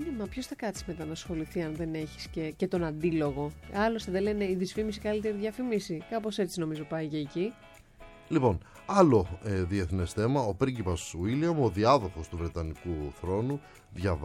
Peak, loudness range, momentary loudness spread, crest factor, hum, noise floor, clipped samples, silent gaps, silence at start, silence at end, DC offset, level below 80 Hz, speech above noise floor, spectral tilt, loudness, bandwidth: -8 dBFS; 5 LU; 11 LU; 22 dB; none; -52 dBFS; under 0.1%; none; 0 s; 0 s; under 0.1%; -48 dBFS; 22 dB; -6.5 dB/octave; -31 LUFS; 16 kHz